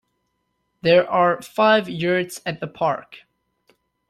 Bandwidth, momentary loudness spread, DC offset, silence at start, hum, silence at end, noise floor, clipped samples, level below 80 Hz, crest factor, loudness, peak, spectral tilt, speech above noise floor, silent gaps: 14 kHz; 12 LU; under 0.1%; 0.85 s; none; 0.9 s; -73 dBFS; under 0.1%; -62 dBFS; 18 dB; -20 LUFS; -4 dBFS; -5 dB/octave; 53 dB; none